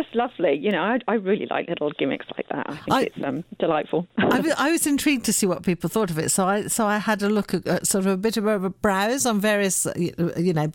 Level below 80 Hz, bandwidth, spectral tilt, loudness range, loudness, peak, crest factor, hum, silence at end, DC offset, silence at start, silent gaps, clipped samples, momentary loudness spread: -56 dBFS; 17.5 kHz; -4 dB/octave; 3 LU; -23 LUFS; -8 dBFS; 14 dB; none; 0 s; under 0.1%; 0 s; none; under 0.1%; 6 LU